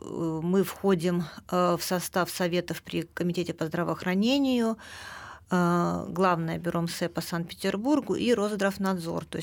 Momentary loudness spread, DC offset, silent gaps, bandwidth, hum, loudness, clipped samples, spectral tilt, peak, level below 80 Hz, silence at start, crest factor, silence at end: 8 LU; under 0.1%; none; over 20 kHz; none; -28 LUFS; under 0.1%; -5.5 dB/octave; -10 dBFS; -60 dBFS; 0.05 s; 18 dB; 0 s